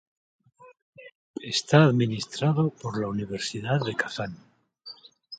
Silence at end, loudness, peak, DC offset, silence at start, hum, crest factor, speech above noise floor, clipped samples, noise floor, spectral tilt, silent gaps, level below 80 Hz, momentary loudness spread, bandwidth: 0.05 s; -26 LUFS; -6 dBFS; under 0.1%; 0.6 s; none; 22 dB; 24 dB; under 0.1%; -49 dBFS; -5.5 dB/octave; 0.82-0.93 s, 1.15-1.34 s; -62 dBFS; 24 LU; 9.2 kHz